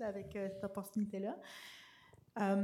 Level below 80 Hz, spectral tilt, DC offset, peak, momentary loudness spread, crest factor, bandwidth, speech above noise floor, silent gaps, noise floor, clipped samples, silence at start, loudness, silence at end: -74 dBFS; -6.5 dB/octave; under 0.1%; -24 dBFS; 16 LU; 18 dB; 15.5 kHz; 24 dB; none; -64 dBFS; under 0.1%; 0 s; -42 LUFS; 0 s